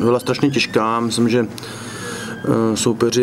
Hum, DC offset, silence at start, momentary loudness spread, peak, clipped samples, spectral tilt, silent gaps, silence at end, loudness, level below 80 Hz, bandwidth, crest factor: none; under 0.1%; 0 s; 11 LU; -2 dBFS; under 0.1%; -5 dB/octave; none; 0 s; -18 LUFS; -54 dBFS; 15.5 kHz; 16 dB